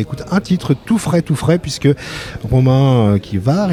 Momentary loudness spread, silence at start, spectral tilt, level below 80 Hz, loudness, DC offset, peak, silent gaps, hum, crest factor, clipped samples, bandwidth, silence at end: 7 LU; 0 s; -7 dB/octave; -38 dBFS; -15 LUFS; under 0.1%; -2 dBFS; none; none; 12 dB; under 0.1%; 13.5 kHz; 0 s